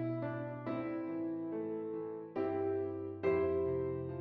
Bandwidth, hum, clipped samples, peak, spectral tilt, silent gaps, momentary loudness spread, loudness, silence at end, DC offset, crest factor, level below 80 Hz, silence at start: 4.7 kHz; none; under 0.1%; -22 dBFS; -8 dB/octave; none; 7 LU; -38 LUFS; 0 s; under 0.1%; 16 dB; -66 dBFS; 0 s